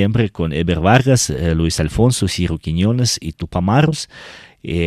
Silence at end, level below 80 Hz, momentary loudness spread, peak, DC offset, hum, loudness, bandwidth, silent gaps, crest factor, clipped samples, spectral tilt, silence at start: 0 s; -34 dBFS; 12 LU; 0 dBFS; under 0.1%; none; -17 LUFS; 14.5 kHz; none; 16 dB; under 0.1%; -5.5 dB/octave; 0 s